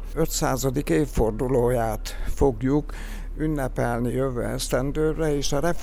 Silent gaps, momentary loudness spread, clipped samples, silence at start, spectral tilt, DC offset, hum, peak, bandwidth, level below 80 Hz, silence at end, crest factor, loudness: none; 7 LU; under 0.1%; 0 s; -5.5 dB/octave; under 0.1%; none; -8 dBFS; 16 kHz; -32 dBFS; 0 s; 16 dB; -25 LUFS